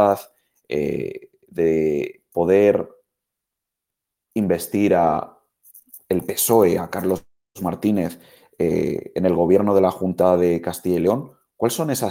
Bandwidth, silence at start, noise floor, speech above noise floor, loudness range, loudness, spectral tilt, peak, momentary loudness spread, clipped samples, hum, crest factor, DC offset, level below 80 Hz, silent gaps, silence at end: 17 kHz; 0 s; -84 dBFS; 65 dB; 3 LU; -20 LUFS; -6 dB/octave; -2 dBFS; 12 LU; under 0.1%; none; 18 dB; under 0.1%; -54 dBFS; none; 0 s